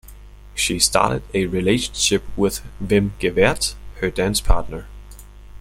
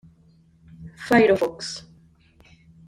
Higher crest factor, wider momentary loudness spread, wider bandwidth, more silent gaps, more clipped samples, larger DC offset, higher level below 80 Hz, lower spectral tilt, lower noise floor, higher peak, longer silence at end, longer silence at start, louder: about the same, 20 dB vs 20 dB; second, 11 LU vs 26 LU; about the same, 16.5 kHz vs 16 kHz; neither; neither; neither; first, -30 dBFS vs -56 dBFS; second, -3.5 dB/octave vs -5 dB/octave; second, -40 dBFS vs -56 dBFS; first, 0 dBFS vs -6 dBFS; second, 0 s vs 1.1 s; second, 0.05 s vs 0.8 s; about the same, -20 LUFS vs -21 LUFS